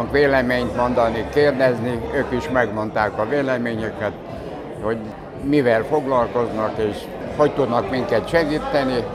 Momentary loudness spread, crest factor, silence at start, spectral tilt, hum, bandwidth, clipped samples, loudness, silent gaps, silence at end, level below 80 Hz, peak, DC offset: 11 LU; 18 dB; 0 s; -6.5 dB/octave; none; 13.5 kHz; under 0.1%; -20 LUFS; none; 0 s; -42 dBFS; -2 dBFS; under 0.1%